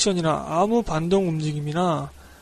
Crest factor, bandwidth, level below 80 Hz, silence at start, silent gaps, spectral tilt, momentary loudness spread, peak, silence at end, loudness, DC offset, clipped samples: 16 dB; 13.5 kHz; -46 dBFS; 0 s; none; -5.5 dB/octave; 5 LU; -8 dBFS; 0.05 s; -23 LUFS; under 0.1%; under 0.1%